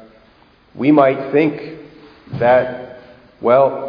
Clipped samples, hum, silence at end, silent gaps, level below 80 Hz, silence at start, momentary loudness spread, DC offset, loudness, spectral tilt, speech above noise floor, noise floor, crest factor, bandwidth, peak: under 0.1%; none; 0 s; none; -54 dBFS; 0.75 s; 20 LU; under 0.1%; -15 LUFS; -9.5 dB/octave; 36 dB; -50 dBFS; 18 dB; 5.2 kHz; 0 dBFS